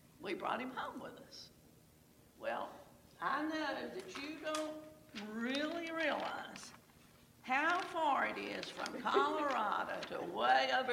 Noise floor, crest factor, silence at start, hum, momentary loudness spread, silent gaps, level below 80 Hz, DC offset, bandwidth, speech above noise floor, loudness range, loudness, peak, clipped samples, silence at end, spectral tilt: -65 dBFS; 20 dB; 0.2 s; none; 18 LU; none; -76 dBFS; under 0.1%; 17 kHz; 27 dB; 8 LU; -38 LUFS; -18 dBFS; under 0.1%; 0 s; -3.5 dB/octave